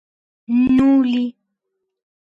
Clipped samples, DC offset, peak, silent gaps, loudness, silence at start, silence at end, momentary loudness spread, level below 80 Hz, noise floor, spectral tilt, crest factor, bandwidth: under 0.1%; under 0.1%; -6 dBFS; none; -17 LUFS; 0.5 s; 1.05 s; 9 LU; -50 dBFS; -77 dBFS; -7.5 dB/octave; 12 dB; 5.4 kHz